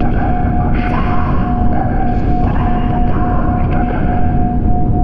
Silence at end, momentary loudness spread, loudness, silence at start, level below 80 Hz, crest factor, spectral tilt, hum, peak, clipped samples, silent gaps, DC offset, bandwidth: 0 s; 1 LU; -16 LUFS; 0 s; -16 dBFS; 10 dB; -10.5 dB/octave; none; -2 dBFS; under 0.1%; none; 6%; 4.9 kHz